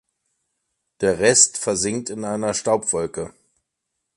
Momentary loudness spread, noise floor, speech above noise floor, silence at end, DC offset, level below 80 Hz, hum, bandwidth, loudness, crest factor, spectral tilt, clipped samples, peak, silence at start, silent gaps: 14 LU; -79 dBFS; 58 dB; 0.85 s; under 0.1%; -54 dBFS; none; 11.5 kHz; -19 LUFS; 22 dB; -2.5 dB/octave; under 0.1%; 0 dBFS; 1 s; none